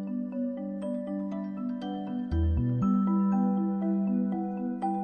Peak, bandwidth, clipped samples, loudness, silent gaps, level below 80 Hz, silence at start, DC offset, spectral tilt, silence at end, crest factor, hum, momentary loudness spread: -16 dBFS; 4.9 kHz; under 0.1%; -30 LUFS; none; -42 dBFS; 0 s; under 0.1%; -10.5 dB/octave; 0 s; 12 dB; none; 8 LU